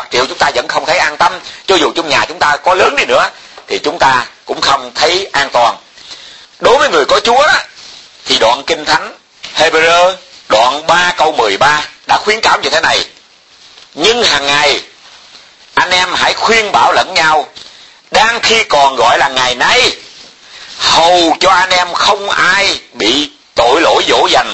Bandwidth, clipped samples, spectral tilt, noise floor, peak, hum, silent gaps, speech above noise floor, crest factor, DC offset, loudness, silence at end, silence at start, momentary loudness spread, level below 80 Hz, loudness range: 11 kHz; 0.2%; -1.5 dB/octave; -42 dBFS; 0 dBFS; none; none; 33 dB; 12 dB; 0.1%; -10 LUFS; 0 s; 0 s; 9 LU; -42 dBFS; 2 LU